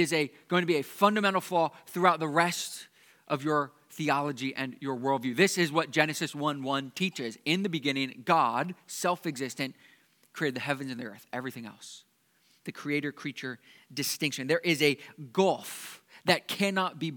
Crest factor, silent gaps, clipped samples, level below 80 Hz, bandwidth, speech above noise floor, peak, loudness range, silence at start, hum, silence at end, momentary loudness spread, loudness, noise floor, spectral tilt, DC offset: 24 dB; none; under 0.1%; -86 dBFS; 19 kHz; 38 dB; -6 dBFS; 8 LU; 0 s; none; 0 s; 14 LU; -29 LUFS; -68 dBFS; -4 dB/octave; under 0.1%